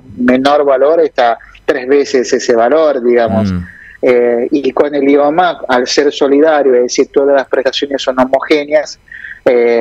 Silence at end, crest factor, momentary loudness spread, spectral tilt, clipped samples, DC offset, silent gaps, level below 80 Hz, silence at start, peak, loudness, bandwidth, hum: 0 s; 10 dB; 7 LU; -4.5 dB/octave; under 0.1%; under 0.1%; none; -46 dBFS; 0.1 s; 0 dBFS; -11 LUFS; 9.2 kHz; none